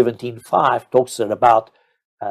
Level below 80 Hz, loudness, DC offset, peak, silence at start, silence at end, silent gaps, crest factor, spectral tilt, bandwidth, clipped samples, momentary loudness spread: -60 dBFS; -17 LUFS; under 0.1%; -2 dBFS; 0 s; 0 s; 2.05-2.17 s; 18 dB; -5.5 dB/octave; 14.5 kHz; under 0.1%; 11 LU